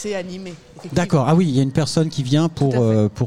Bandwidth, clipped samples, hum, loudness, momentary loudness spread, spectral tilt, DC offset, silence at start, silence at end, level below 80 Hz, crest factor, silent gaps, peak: 11.5 kHz; under 0.1%; none; -19 LUFS; 15 LU; -6.5 dB/octave; 0.6%; 0 s; 0 s; -48 dBFS; 12 dB; none; -6 dBFS